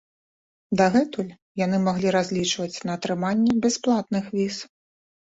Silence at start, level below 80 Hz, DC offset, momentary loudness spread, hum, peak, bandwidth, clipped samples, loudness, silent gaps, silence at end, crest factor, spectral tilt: 0.7 s; -60 dBFS; under 0.1%; 9 LU; none; -8 dBFS; 8 kHz; under 0.1%; -24 LUFS; 1.42-1.55 s; 0.6 s; 16 dB; -5 dB/octave